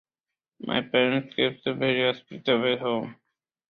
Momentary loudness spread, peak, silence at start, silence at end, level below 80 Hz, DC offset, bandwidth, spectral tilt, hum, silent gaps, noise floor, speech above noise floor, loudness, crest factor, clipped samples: 8 LU; -8 dBFS; 0.6 s; 0.55 s; -68 dBFS; under 0.1%; 5.8 kHz; -7.5 dB/octave; none; none; -90 dBFS; 64 dB; -25 LUFS; 20 dB; under 0.1%